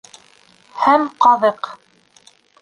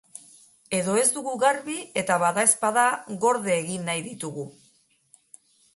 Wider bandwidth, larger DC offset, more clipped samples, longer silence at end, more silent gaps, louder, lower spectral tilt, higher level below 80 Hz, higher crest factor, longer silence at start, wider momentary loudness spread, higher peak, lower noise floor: about the same, 11 kHz vs 12 kHz; neither; neither; second, 0.85 s vs 1.25 s; neither; first, -15 LUFS vs -24 LUFS; first, -4.5 dB/octave vs -3 dB/octave; about the same, -68 dBFS vs -72 dBFS; about the same, 18 dB vs 22 dB; about the same, 0.75 s vs 0.7 s; first, 18 LU vs 14 LU; about the same, -2 dBFS vs -4 dBFS; second, -52 dBFS vs -63 dBFS